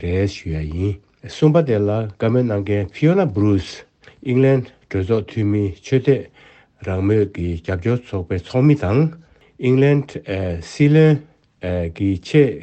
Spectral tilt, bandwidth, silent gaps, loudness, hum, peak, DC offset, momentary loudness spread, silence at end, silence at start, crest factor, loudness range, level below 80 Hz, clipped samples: -8.5 dB/octave; 8.4 kHz; none; -19 LUFS; none; -2 dBFS; under 0.1%; 11 LU; 0 s; 0 s; 16 dB; 3 LU; -46 dBFS; under 0.1%